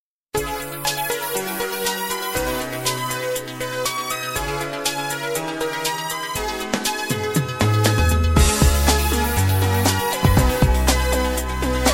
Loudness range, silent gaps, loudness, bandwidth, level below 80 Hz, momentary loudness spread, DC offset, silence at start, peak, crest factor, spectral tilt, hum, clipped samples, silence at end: 6 LU; none; -21 LUFS; 16.5 kHz; -26 dBFS; 8 LU; under 0.1%; 0.35 s; -2 dBFS; 18 dB; -4 dB/octave; none; under 0.1%; 0 s